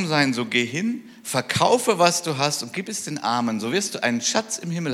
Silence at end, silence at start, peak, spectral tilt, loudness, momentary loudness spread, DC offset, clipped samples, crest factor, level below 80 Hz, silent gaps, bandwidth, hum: 0 s; 0 s; -2 dBFS; -3.5 dB/octave; -22 LUFS; 9 LU; under 0.1%; under 0.1%; 22 dB; -66 dBFS; none; 16 kHz; none